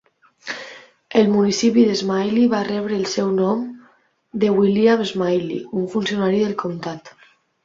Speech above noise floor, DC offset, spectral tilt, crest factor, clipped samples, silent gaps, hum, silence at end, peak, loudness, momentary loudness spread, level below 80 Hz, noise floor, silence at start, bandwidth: 38 dB; under 0.1%; -5.5 dB/octave; 18 dB; under 0.1%; none; none; 0.55 s; -2 dBFS; -19 LUFS; 16 LU; -62 dBFS; -56 dBFS; 0.45 s; 7.6 kHz